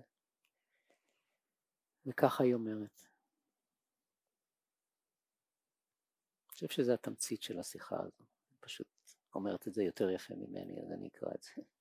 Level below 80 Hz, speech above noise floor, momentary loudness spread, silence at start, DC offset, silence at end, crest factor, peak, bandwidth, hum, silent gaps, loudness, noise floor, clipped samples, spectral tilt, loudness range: -80 dBFS; over 52 dB; 16 LU; 2.05 s; under 0.1%; 0.2 s; 28 dB; -14 dBFS; 16 kHz; none; none; -39 LUFS; under -90 dBFS; under 0.1%; -5 dB/octave; 4 LU